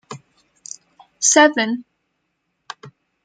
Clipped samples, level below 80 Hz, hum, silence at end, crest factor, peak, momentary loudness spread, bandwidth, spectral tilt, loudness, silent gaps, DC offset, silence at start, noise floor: under 0.1%; -74 dBFS; none; 0.35 s; 20 dB; -2 dBFS; 26 LU; 10 kHz; -1 dB/octave; -15 LUFS; none; under 0.1%; 0.1 s; -73 dBFS